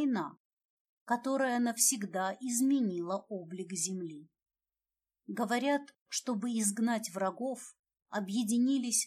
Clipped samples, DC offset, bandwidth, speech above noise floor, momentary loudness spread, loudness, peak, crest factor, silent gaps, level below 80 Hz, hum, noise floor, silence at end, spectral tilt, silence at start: under 0.1%; under 0.1%; 15.5 kHz; over 57 dB; 13 LU; -33 LUFS; -14 dBFS; 20 dB; 0.40-0.57 s, 0.65-1.06 s, 6.01-6.06 s, 7.79-7.84 s; under -90 dBFS; none; under -90 dBFS; 0 s; -3 dB/octave; 0 s